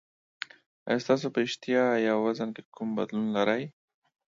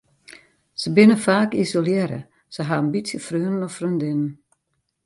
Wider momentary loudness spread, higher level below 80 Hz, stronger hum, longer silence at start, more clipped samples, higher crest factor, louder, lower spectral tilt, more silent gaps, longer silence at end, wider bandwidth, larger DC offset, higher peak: about the same, 16 LU vs 15 LU; second, -76 dBFS vs -64 dBFS; neither; first, 0.85 s vs 0.3 s; neither; about the same, 18 dB vs 20 dB; second, -28 LUFS vs -21 LUFS; about the same, -5.5 dB/octave vs -6 dB/octave; first, 2.65-2.72 s vs none; about the same, 0.6 s vs 0.7 s; second, 7.6 kHz vs 11.5 kHz; neither; second, -10 dBFS vs 0 dBFS